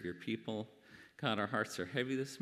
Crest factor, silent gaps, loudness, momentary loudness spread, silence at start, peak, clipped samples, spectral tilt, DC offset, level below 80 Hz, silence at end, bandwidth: 22 dB; none; -39 LUFS; 16 LU; 0 s; -18 dBFS; under 0.1%; -5 dB/octave; under 0.1%; -80 dBFS; 0 s; 15 kHz